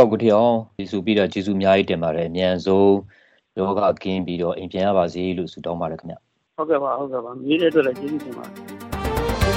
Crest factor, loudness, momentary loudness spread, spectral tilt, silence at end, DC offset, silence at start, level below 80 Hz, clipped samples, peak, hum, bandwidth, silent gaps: 20 dB; -21 LUFS; 16 LU; -6.5 dB/octave; 0 s; under 0.1%; 0 s; -40 dBFS; under 0.1%; -2 dBFS; none; 16.5 kHz; none